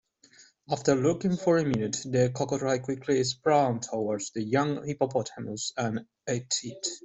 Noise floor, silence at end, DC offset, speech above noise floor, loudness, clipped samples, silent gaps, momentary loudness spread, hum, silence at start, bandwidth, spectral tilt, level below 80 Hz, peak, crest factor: -58 dBFS; 0.05 s; under 0.1%; 30 dB; -28 LUFS; under 0.1%; none; 9 LU; none; 0.4 s; 8.2 kHz; -5 dB/octave; -64 dBFS; -10 dBFS; 18 dB